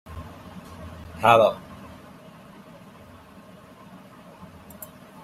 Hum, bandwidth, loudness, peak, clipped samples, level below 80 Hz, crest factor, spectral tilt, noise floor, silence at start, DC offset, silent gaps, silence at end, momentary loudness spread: none; 16 kHz; -19 LUFS; -2 dBFS; under 0.1%; -56 dBFS; 26 dB; -5 dB/octave; -47 dBFS; 0.1 s; under 0.1%; none; 3.65 s; 29 LU